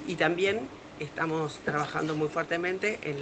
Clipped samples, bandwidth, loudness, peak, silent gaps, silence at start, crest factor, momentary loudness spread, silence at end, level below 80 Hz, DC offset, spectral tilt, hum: under 0.1%; 9 kHz; -30 LUFS; -10 dBFS; none; 0 s; 20 dB; 9 LU; 0 s; -64 dBFS; under 0.1%; -5.5 dB/octave; none